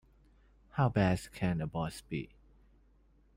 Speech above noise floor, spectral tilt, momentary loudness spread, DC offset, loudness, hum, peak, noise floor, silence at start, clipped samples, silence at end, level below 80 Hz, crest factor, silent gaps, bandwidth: 33 dB; -7 dB/octave; 12 LU; under 0.1%; -34 LUFS; none; -18 dBFS; -66 dBFS; 0.75 s; under 0.1%; 1.1 s; -56 dBFS; 18 dB; none; 16 kHz